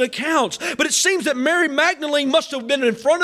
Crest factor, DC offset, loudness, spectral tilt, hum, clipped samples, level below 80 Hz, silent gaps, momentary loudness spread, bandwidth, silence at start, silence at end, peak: 14 dB; under 0.1%; -18 LUFS; -1.5 dB/octave; none; under 0.1%; -66 dBFS; none; 4 LU; 16 kHz; 0 s; 0 s; -6 dBFS